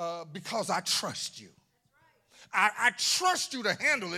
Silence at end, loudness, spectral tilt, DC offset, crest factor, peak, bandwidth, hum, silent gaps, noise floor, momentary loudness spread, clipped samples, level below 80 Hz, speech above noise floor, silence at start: 0 s; -28 LUFS; -1 dB/octave; under 0.1%; 22 dB; -10 dBFS; 16.5 kHz; none; none; -68 dBFS; 12 LU; under 0.1%; -80 dBFS; 38 dB; 0 s